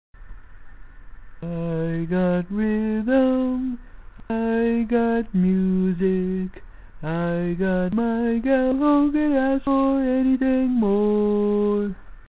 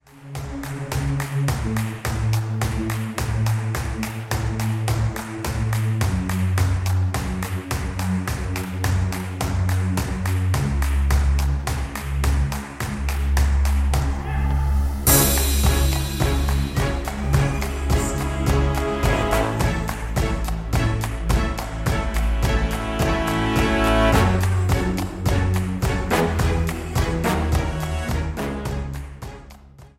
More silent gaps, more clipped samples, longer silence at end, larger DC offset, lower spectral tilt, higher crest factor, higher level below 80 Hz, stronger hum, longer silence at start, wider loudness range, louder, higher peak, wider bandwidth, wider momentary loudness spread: neither; neither; about the same, 0.2 s vs 0.1 s; first, 0.1% vs under 0.1%; first, -12.5 dB/octave vs -5 dB/octave; about the same, 14 dB vs 18 dB; second, -44 dBFS vs -26 dBFS; neither; about the same, 0.2 s vs 0.15 s; about the same, 4 LU vs 4 LU; about the same, -22 LUFS vs -22 LUFS; second, -8 dBFS vs -2 dBFS; second, 4 kHz vs 16.5 kHz; about the same, 10 LU vs 8 LU